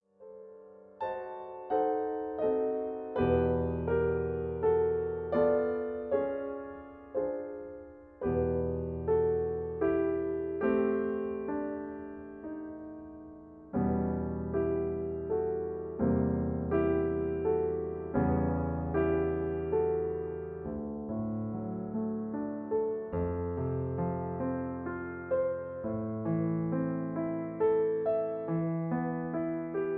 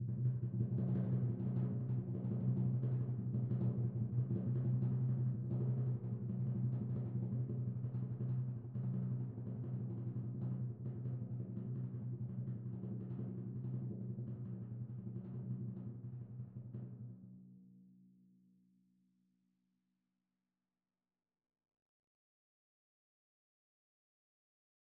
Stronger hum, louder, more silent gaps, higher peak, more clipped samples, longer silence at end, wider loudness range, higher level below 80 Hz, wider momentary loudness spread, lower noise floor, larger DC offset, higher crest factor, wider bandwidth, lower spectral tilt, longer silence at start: neither; first, -32 LUFS vs -41 LUFS; neither; first, -16 dBFS vs -26 dBFS; neither; second, 0 s vs 6.9 s; second, 4 LU vs 11 LU; first, -50 dBFS vs -68 dBFS; about the same, 13 LU vs 11 LU; second, -53 dBFS vs under -90 dBFS; neither; about the same, 16 dB vs 16 dB; first, 3.8 kHz vs 1.9 kHz; second, -12 dB/octave vs -13.5 dB/octave; first, 0.2 s vs 0 s